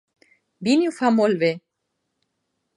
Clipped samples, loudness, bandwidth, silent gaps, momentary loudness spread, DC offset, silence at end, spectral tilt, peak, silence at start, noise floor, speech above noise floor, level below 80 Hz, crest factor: under 0.1%; -21 LUFS; 11.5 kHz; none; 9 LU; under 0.1%; 1.2 s; -5.5 dB/octave; -6 dBFS; 0.6 s; -77 dBFS; 58 dB; -72 dBFS; 18 dB